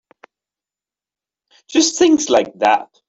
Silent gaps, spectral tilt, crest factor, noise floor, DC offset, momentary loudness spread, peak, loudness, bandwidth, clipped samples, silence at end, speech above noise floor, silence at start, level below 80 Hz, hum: none; -2 dB/octave; 16 dB; -90 dBFS; under 0.1%; 4 LU; -2 dBFS; -15 LUFS; 8.2 kHz; under 0.1%; 0.25 s; 75 dB; 1.7 s; -60 dBFS; 50 Hz at -65 dBFS